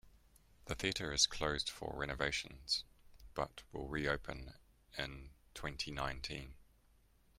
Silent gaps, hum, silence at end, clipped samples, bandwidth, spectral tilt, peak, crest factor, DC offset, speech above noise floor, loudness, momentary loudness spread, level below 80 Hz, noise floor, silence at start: none; none; 0.75 s; under 0.1%; 16 kHz; -2.5 dB/octave; -16 dBFS; 26 dB; under 0.1%; 29 dB; -40 LUFS; 19 LU; -56 dBFS; -70 dBFS; 0.05 s